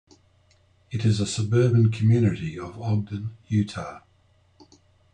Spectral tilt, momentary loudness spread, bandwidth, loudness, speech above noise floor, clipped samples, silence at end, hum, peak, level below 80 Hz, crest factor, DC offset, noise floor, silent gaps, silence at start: -7 dB/octave; 14 LU; 9.6 kHz; -24 LUFS; 38 dB; under 0.1%; 1.15 s; none; -10 dBFS; -56 dBFS; 16 dB; under 0.1%; -61 dBFS; none; 0.9 s